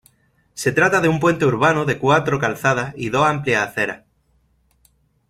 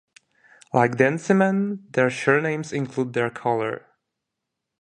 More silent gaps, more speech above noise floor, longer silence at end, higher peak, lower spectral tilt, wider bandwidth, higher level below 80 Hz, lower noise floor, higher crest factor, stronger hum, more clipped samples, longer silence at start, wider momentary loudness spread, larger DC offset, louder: neither; second, 44 dB vs 61 dB; first, 1.35 s vs 1.05 s; about the same, -2 dBFS vs -2 dBFS; about the same, -5.5 dB/octave vs -6.5 dB/octave; first, 15.5 kHz vs 10.5 kHz; first, -52 dBFS vs -66 dBFS; second, -62 dBFS vs -82 dBFS; about the same, 18 dB vs 22 dB; neither; neither; second, 0.55 s vs 0.75 s; about the same, 8 LU vs 8 LU; neither; first, -18 LUFS vs -22 LUFS